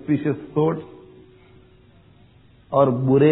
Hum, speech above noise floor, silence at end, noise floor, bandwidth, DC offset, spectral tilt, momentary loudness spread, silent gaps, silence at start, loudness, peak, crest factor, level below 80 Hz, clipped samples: none; 34 dB; 0 s; -52 dBFS; 4 kHz; under 0.1%; -8 dB/octave; 12 LU; none; 0.05 s; -21 LUFS; -4 dBFS; 18 dB; -58 dBFS; under 0.1%